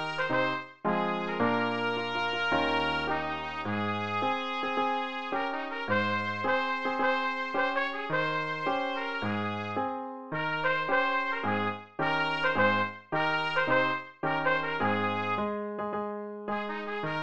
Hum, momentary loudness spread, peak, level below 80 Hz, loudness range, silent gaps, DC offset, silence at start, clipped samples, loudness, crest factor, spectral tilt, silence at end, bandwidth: none; 7 LU; -12 dBFS; -62 dBFS; 3 LU; none; 0.4%; 0 s; under 0.1%; -30 LUFS; 18 dB; -6 dB/octave; 0 s; 8.4 kHz